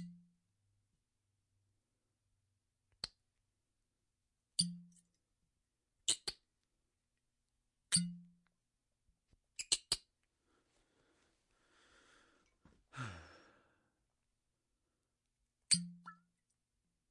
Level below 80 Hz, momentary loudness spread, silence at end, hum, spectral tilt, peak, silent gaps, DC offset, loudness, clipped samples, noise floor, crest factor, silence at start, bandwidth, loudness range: -76 dBFS; 22 LU; 0.95 s; none; -1.5 dB/octave; -16 dBFS; none; under 0.1%; -38 LUFS; under 0.1%; -88 dBFS; 32 dB; 0 s; 11 kHz; 17 LU